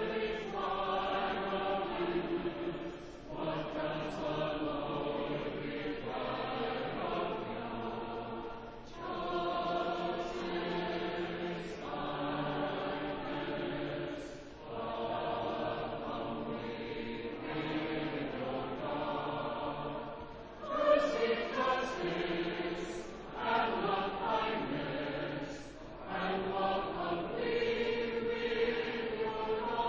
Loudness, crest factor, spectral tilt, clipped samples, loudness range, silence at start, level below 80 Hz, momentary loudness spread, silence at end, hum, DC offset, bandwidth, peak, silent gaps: -36 LUFS; 20 dB; -6 dB/octave; under 0.1%; 4 LU; 0 s; -58 dBFS; 9 LU; 0 s; none; under 0.1%; 8 kHz; -16 dBFS; none